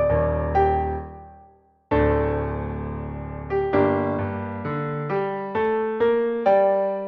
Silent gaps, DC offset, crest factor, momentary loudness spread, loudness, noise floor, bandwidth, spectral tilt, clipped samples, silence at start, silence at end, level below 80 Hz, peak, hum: none; under 0.1%; 16 dB; 11 LU; -23 LUFS; -54 dBFS; 6 kHz; -10 dB/octave; under 0.1%; 0 s; 0 s; -36 dBFS; -8 dBFS; none